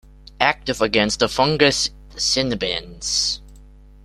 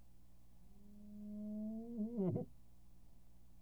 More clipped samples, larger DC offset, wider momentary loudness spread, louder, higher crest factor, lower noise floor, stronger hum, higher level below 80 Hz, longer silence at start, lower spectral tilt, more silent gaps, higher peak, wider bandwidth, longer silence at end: neither; second, under 0.1% vs 0.1%; second, 8 LU vs 23 LU; first, -19 LUFS vs -45 LUFS; about the same, 22 dB vs 20 dB; second, -44 dBFS vs -66 dBFS; first, 50 Hz at -40 dBFS vs 60 Hz at -65 dBFS; first, -42 dBFS vs -66 dBFS; first, 0.4 s vs 0 s; second, -2.5 dB/octave vs -10.5 dB/octave; neither; first, 0 dBFS vs -28 dBFS; second, 14.5 kHz vs over 20 kHz; first, 0.4 s vs 0 s